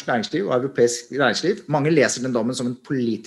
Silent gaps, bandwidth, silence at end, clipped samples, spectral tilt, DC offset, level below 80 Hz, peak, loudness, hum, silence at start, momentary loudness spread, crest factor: none; 12.5 kHz; 0 s; under 0.1%; -4.5 dB/octave; under 0.1%; -66 dBFS; -4 dBFS; -21 LUFS; none; 0 s; 7 LU; 18 dB